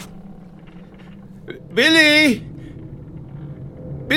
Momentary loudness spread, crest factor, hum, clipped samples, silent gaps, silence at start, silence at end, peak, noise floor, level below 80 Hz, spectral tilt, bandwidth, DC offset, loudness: 26 LU; 20 dB; none; under 0.1%; none; 0 s; 0 s; 0 dBFS; -40 dBFS; -46 dBFS; -3.5 dB/octave; 17 kHz; under 0.1%; -14 LUFS